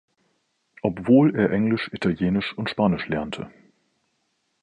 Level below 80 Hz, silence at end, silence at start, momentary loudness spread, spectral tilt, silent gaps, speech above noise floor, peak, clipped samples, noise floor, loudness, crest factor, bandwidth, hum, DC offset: -52 dBFS; 1.15 s; 0.85 s; 12 LU; -8 dB/octave; none; 51 dB; -6 dBFS; under 0.1%; -72 dBFS; -22 LUFS; 18 dB; 9.6 kHz; none; under 0.1%